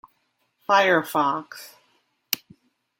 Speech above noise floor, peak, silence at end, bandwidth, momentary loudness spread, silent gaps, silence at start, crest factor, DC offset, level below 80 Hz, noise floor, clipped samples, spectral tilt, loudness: 49 dB; 0 dBFS; 0.65 s; 17 kHz; 22 LU; none; 0.7 s; 26 dB; under 0.1%; -74 dBFS; -71 dBFS; under 0.1%; -3.5 dB/octave; -22 LUFS